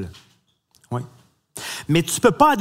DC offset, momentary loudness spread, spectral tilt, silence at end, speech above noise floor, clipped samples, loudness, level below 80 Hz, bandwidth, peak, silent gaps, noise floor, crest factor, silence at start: under 0.1%; 22 LU; -4.5 dB/octave; 0 s; 43 dB; under 0.1%; -20 LUFS; -54 dBFS; 16 kHz; 0 dBFS; none; -62 dBFS; 22 dB; 0 s